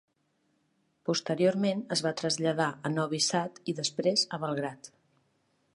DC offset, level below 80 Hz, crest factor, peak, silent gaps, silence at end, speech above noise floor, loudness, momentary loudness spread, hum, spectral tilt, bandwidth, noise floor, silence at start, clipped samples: under 0.1%; -76 dBFS; 18 dB; -12 dBFS; none; 0.85 s; 44 dB; -30 LUFS; 8 LU; none; -4 dB/octave; 11.5 kHz; -74 dBFS; 1.05 s; under 0.1%